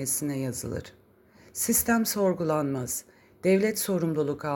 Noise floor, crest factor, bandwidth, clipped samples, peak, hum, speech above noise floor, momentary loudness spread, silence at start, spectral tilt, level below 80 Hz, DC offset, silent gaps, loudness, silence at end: -57 dBFS; 16 dB; 17 kHz; under 0.1%; -12 dBFS; none; 30 dB; 11 LU; 0 s; -4.5 dB/octave; -56 dBFS; under 0.1%; none; -27 LUFS; 0 s